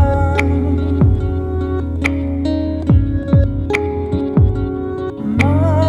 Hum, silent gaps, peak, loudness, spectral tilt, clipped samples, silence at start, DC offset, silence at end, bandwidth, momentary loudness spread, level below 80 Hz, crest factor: none; none; -2 dBFS; -17 LUFS; -8.5 dB/octave; under 0.1%; 0 s; under 0.1%; 0 s; 7.8 kHz; 6 LU; -24 dBFS; 14 dB